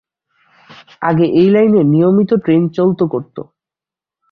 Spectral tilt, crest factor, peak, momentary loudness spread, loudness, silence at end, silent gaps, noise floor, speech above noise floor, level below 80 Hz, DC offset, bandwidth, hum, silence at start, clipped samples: -10.5 dB/octave; 12 dB; -2 dBFS; 12 LU; -13 LUFS; 0.9 s; none; -88 dBFS; 76 dB; -56 dBFS; under 0.1%; 5.4 kHz; none; 1 s; under 0.1%